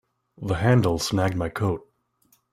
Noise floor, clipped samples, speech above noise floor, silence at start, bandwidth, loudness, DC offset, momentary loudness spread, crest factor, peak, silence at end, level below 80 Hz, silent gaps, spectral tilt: -65 dBFS; under 0.1%; 43 dB; 0.4 s; 15.5 kHz; -24 LUFS; under 0.1%; 11 LU; 18 dB; -6 dBFS; 0.7 s; -48 dBFS; none; -6 dB/octave